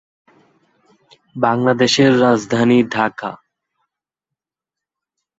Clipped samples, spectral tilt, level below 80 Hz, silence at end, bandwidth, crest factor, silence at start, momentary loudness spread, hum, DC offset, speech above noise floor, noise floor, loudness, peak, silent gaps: under 0.1%; -5 dB/octave; -60 dBFS; 2.05 s; 8 kHz; 18 dB; 1.35 s; 15 LU; none; under 0.1%; 72 dB; -86 dBFS; -15 LUFS; 0 dBFS; none